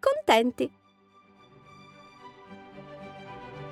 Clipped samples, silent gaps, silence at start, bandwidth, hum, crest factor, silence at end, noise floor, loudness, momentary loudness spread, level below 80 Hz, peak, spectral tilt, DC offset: under 0.1%; none; 0.05 s; 15.5 kHz; none; 24 dB; 0 s; -60 dBFS; -25 LUFS; 28 LU; -66 dBFS; -6 dBFS; -4 dB/octave; under 0.1%